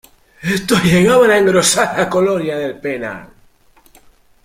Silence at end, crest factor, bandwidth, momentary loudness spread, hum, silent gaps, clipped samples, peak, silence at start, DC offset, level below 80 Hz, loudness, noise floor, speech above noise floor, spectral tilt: 1.2 s; 16 dB; 16 kHz; 14 LU; none; none; under 0.1%; 0 dBFS; 0.4 s; under 0.1%; -46 dBFS; -14 LUFS; -50 dBFS; 36 dB; -4 dB/octave